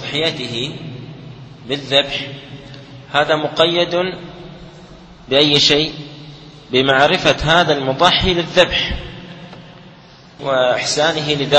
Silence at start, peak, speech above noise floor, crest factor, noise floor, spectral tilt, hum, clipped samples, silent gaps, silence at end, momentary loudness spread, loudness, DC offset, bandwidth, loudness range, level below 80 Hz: 0 s; 0 dBFS; 27 dB; 18 dB; -42 dBFS; -4 dB/octave; none; under 0.1%; none; 0 s; 23 LU; -15 LUFS; under 0.1%; 8.8 kHz; 6 LU; -38 dBFS